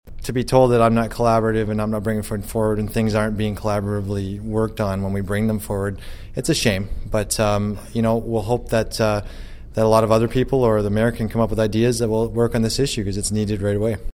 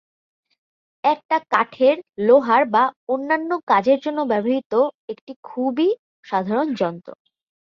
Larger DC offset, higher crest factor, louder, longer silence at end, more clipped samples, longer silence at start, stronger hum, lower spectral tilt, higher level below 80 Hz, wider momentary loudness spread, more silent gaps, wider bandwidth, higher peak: neither; about the same, 18 dB vs 18 dB; about the same, -20 LUFS vs -20 LUFS; second, 0.05 s vs 0.65 s; neither; second, 0.05 s vs 1.05 s; neither; about the same, -6 dB/octave vs -7 dB/octave; first, -34 dBFS vs -70 dBFS; about the same, 9 LU vs 10 LU; second, none vs 1.25-1.29 s, 2.96-3.07 s, 3.63-3.67 s, 4.65-4.70 s, 4.95-5.08 s, 5.21-5.27 s, 5.36-5.43 s, 5.99-6.23 s; first, 16.5 kHz vs 7 kHz; about the same, -2 dBFS vs -4 dBFS